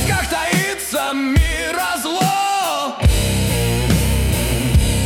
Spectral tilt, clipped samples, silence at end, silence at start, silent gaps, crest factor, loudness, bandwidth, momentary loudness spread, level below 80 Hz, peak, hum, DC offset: -4.5 dB/octave; under 0.1%; 0 s; 0 s; none; 14 dB; -18 LUFS; 17.5 kHz; 3 LU; -22 dBFS; -2 dBFS; none; under 0.1%